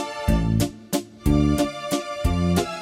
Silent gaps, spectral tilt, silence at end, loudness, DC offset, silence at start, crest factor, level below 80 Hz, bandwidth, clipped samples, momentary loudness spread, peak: none; -6 dB/octave; 0 s; -23 LUFS; under 0.1%; 0 s; 16 dB; -30 dBFS; 16 kHz; under 0.1%; 7 LU; -6 dBFS